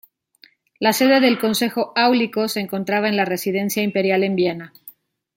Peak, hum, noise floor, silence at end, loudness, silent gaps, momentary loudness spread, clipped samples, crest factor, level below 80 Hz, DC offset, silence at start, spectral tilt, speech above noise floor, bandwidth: -2 dBFS; none; -54 dBFS; 0.45 s; -19 LUFS; none; 8 LU; under 0.1%; 18 dB; -66 dBFS; under 0.1%; 0.8 s; -4.5 dB/octave; 36 dB; 17 kHz